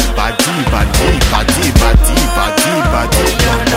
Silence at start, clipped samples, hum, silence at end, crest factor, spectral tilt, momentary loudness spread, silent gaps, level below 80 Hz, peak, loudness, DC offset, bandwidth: 0 s; 0.2%; none; 0 s; 10 dB; -4 dB/octave; 3 LU; none; -14 dBFS; 0 dBFS; -12 LUFS; under 0.1%; 16.5 kHz